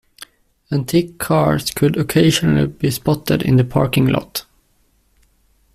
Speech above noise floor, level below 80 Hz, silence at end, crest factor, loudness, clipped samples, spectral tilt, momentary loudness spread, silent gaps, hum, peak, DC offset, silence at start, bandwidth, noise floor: 43 dB; -42 dBFS; 1.35 s; 16 dB; -17 LUFS; under 0.1%; -6 dB/octave; 7 LU; none; none; -2 dBFS; under 0.1%; 0.2 s; 16 kHz; -59 dBFS